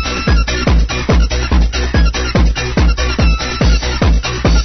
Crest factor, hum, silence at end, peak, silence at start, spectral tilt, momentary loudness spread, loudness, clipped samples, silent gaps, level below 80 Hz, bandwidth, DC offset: 12 dB; none; 0 s; 0 dBFS; 0 s; -5 dB/octave; 1 LU; -14 LUFS; under 0.1%; none; -14 dBFS; 6.4 kHz; under 0.1%